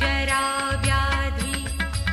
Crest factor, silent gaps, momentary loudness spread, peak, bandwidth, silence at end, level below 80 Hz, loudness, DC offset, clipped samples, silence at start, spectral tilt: 14 dB; none; 5 LU; -8 dBFS; 14.5 kHz; 0 s; -28 dBFS; -23 LUFS; under 0.1%; under 0.1%; 0 s; -3.5 dB/octave